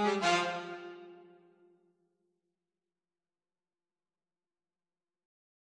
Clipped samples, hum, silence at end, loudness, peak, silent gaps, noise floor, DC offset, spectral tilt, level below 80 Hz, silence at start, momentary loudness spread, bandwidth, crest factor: under 0.1%; none; 4.55 s; -32 LUFS; -16 dBFS; none; under -90 dBFS; under 0.1%; -3.5 dB/octave; -88 dBFS; 0 s; 23 LU; 10 kHz; 24 dB